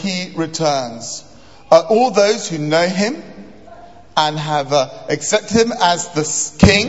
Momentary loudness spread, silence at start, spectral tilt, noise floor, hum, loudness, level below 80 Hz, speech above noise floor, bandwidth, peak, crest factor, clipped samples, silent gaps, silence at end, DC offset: 10 LU; 0 s; -4 dB/octave; -40 dBFS; none; -16 LUFS; -38 dBFS; 25 dB; 8.2 kHz; 0 dBFS; 16 dB; under 0.1%; none; 0 s; 0.7%